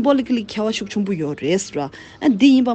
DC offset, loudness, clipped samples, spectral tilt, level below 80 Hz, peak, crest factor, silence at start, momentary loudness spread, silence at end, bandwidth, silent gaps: under 0.1%; -19 LUFS; under 0.1%; -5 dB/octave; -56 dBFS; -2 dBFS; 16 dB; 0 s; 11 LU; 0 s; 8.6 kHz; none